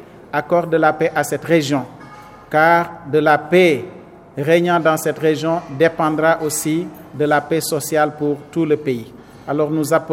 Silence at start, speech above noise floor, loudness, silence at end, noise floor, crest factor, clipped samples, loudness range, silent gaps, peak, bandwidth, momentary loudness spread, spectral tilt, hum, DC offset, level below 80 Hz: 0 s; 22 dB; -17 LUFS; 0 s; -39 dBFS; 18 dB; under 0.1%; 3 LU; none; 0 dBFS; 16 kHz; 11 LU; -5 dB/octave; none; under 0.1%; -56 dBFS